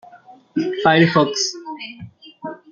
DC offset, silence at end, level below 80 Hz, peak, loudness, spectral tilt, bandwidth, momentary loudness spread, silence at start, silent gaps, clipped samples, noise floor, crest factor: under 0.1%; 0.15 s; -60 dBFS; -2 dBFS; -17 LUFS; -4.5 dB/octave; 7.6 kHz; 20 LU; 0.15 s; none; under 0.1%; -46 dBFS; 18 dB